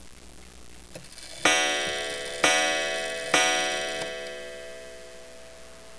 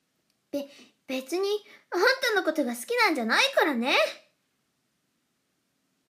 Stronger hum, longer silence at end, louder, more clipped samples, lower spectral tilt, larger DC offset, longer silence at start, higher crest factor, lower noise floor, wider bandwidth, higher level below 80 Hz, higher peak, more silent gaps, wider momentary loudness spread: neither; second, 0 s vs 1.95 s; about the same, -24 LUFS vs -25 LUFS; neither; second, -0.5 dB/octave vs -2 dB/octave; first, 0.4% vs under 0.1%; second, 0 s vs 0.55 s; about the same, 22 dB vs 20 dB; second, -48 dBFS vs -75 dBFS; second, 11 kHz vs 15.5 kHz; first, -56 dBFS vs under -90 dBFS; about the same, -8 dBFS vs -8 dBFS; neither; first, 24 LU vs 14 LU